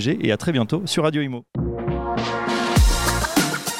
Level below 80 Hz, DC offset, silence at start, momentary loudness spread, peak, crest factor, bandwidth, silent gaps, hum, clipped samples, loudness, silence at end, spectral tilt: -28 dBFS; under 0.1%; 0 s; 8 LU; -6 dBFS; 16 dB; 16.5 kHz; none; none; under 0.1%; -21 LUFS; 0 s; -4.5 dB/octave